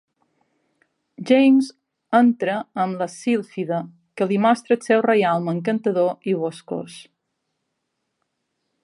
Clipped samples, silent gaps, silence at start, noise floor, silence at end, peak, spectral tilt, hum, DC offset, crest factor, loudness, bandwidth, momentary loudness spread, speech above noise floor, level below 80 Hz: under 0.1%; none; 1.2 s; -77 dBFS; 1.8 s; -4 dBFS; -6.5 dB/octave; none; under 0.1%; 18 dB; -20 LUFS; 11.5 kHz; 14 LU; 57 dB; -76 dBFS